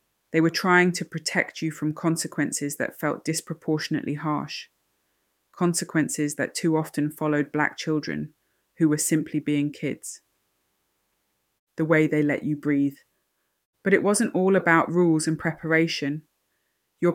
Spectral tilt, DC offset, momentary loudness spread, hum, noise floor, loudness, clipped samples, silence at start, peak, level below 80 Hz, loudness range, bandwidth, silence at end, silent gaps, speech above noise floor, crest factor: -5 dB/octave; under 0.1%; 11 LU; none; -75 dBFS; -24 LUFS; under 0.1%; 0.35 s; -4 dBFS; -68 dBFS; 5 LU; 17 kHz; 0 s; 11.59-11.67 s, 13.65-13.73 s; 50 dB; 20 dB